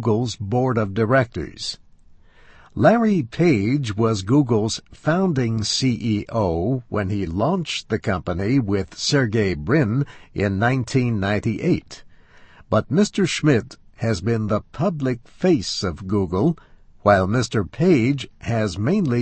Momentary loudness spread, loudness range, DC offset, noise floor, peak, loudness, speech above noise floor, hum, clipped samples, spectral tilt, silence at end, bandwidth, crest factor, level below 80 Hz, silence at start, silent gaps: 7 LU; 2 LU; under 0.1%; -48 dBFS; -2 dBFS; -21 LUFS; 28 dB; none; under 0.1%; -6 dB/octave; 0 s; 8.8 kHz; 18 dB; -46 dBFS; 0 s; none